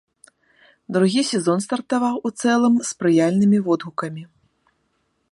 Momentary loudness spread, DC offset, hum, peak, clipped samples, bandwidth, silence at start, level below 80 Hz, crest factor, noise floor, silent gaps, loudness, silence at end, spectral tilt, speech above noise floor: 10 LU; under 0.1%; none; -6 dBFS; under 0.1%; 11.5 kHz; 0.9 s; -66 dBFS; 16 dB; -69 dBFS; none; -20 LUFS; 1.05 s; -5.5 dB/octave; 50 dB